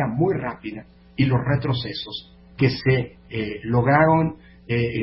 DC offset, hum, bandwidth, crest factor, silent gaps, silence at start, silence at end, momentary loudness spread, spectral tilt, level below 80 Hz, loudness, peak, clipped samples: under 0.1%; none; 5.8 kHz; 20 dB; none; 0 s; 0 s; 17 LU; -11.5 dB/octave; -46 dBFS; -22 LUFS; -2 dBFS; under 0.1%